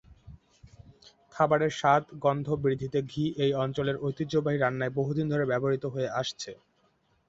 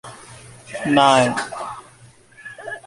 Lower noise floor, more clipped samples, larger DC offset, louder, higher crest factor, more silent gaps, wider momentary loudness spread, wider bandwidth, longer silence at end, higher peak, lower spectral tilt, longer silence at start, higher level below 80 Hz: first, -69 dBFS vs -48 dBFS; neither; neither; second, -28 LUFS vs -17 LUFS; about the same, 20 dB vs 20 dB; neither; second, 7 LU vs 26 LU; second, 8 kHz vs 11.5 kHz; first, 0.75 s vs 0.05 s; second, -10 dBFS vs 0 dBFS; first, -6.5 dB/octave vs -4 dB/octave; about the same, 0.1 s vs 0.05 s; about the same, -60 dBFS vs -58 dBFS